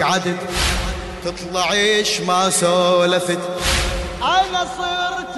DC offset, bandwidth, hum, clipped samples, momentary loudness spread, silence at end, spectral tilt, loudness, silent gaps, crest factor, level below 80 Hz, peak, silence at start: under 0.1%; 12.5 kHz; none; under 0.1%; 8 LU; 0 s; -3 dB/octave; -18 LUFS; none; 14 dB; -32 dBFS; -6 dBFS; 0 s